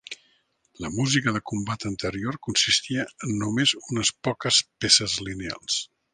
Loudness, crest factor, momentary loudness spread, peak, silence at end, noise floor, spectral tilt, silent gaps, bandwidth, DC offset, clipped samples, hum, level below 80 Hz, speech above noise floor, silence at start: -24 LUFS; 22 dB; 13 LU; -4 dBFS; 0.3 s; -66 dBFS; -2.5 dB/octave; none; 10.5 kHz; under 0.1%; under 0.1%; none; -54 dBFS; 41 dB; 0.1 s